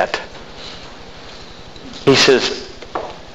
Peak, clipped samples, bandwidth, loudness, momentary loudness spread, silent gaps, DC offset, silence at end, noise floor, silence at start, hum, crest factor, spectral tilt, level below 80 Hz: 0 dBFS; under 0.1%; 13 kHz; -16 LUFS; 25 LU; none; 1%; 0 s; -36 dBFS; 0 s; none; 20 dB; -3.5 dB/octave; -44 dBFS